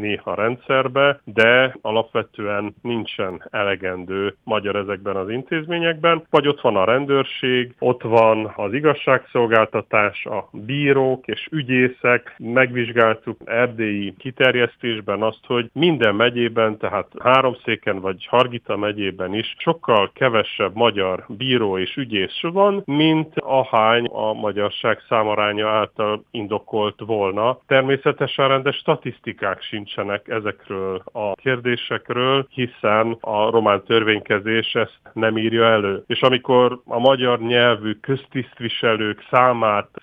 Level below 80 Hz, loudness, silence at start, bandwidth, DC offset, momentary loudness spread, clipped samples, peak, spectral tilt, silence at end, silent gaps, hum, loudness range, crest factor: -64 dBFS; -19 LUFS; 0 s; 5.4 kHz; under 0.1%; 9 LU; under 0.1%; -2 dBFS; -7.5 dB/octave; 0.2 s; none; none; 4 LU; 18 dB